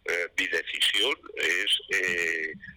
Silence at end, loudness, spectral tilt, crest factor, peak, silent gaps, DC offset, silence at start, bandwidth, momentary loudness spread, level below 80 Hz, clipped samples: 0 s; -25 LUFS; -0.5 dB/octave; 10 dB; -18 dBFS; none; under 0.1%; 0.05 s; 19 kHz; 5 LU; -64 dBFS; under 0.1%